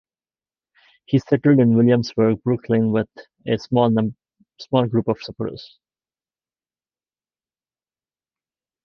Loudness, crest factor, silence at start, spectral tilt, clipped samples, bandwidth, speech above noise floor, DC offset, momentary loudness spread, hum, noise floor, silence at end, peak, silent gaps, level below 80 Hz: -20 LUFS; 20 dB; 1.1 s; -8.5 dB/octave; under 0.1%; 6.6 kHz; over 71 dB; under 0.1%; 14 LU; none; under -90 dBFS; 3.2 s; -2 dBFS; none; -58 dBFS